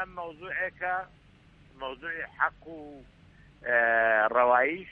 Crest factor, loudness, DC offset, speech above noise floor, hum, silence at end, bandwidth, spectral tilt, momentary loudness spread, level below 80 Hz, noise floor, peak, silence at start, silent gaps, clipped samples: 20 dB; -27 LUFS; under 0.1%; 29 dB; none; 0 s; 4.7 kHz; -6.5 dB/octave; 22 LU; -60 dBFS; -57 dBFS; -10 dBFS; 0 s; none; under 0.1%